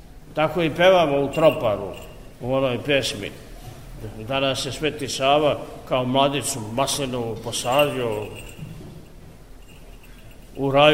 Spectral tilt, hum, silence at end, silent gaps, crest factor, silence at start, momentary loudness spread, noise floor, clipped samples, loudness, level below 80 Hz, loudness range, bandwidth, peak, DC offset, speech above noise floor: -4 dB/octave; none; 0 s; none; 20 dB; 0 s; 20 LU; -44 dBFS; under 0.1%; -22 LUFS; -46 dBFS; 6 LU; 16 kHz; -2 dBFS; 0.3%; 23 dB